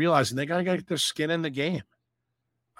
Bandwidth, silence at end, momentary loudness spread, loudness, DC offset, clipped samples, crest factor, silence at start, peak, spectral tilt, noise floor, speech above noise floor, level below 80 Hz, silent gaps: 16.5 kHz; 0.95 s; 6 LU; -27 LUFS; under 0.1%; under 0.1%; 22 dB; 0 s; -6 dBFS; -4.5 dB/octave; -81 dBFS; 54 dB; -66 dBFS; none